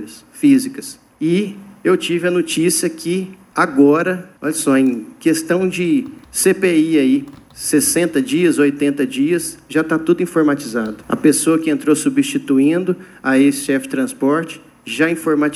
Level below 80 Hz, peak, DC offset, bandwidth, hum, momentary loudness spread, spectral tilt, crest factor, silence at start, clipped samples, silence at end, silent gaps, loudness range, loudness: -58 dBFS; 0 dBFS; under 0.1%; 13.5 kHz; none; 9 LU; -4.5 dB/octave; 16 dB; 0 s; under 0.1%; 0 s; none; 1 LU; -16 LUFS